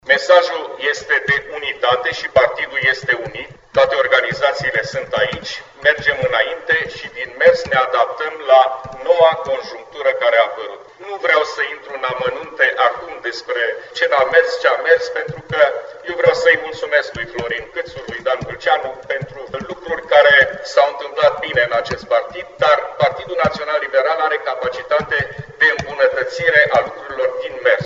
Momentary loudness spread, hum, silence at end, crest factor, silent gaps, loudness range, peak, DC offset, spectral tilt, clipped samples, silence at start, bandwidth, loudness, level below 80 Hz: 13 LU; none; 0 s; 16 dB; none; 3 LU; 0 dBFS; under 0.1%; -3.5 dB/octave; under 0.1%; 0.05 s; 7.8 kHz; -16 LUFS; -50 dBFS